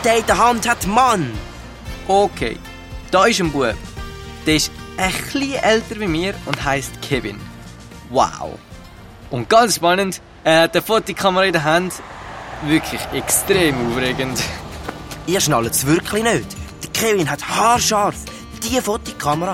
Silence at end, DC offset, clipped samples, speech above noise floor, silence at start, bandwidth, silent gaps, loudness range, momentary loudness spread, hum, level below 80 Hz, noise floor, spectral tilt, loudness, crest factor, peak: 0 s; under 0.1%; under 0.1%; 21 dB; 0 s; 16.5 kHz; none; 4 LU; 17 LU; none; -38 dBFS; -38 dBFS; -3.5 dB/octave; -18 LUFS; 18 dB; -2 dBFS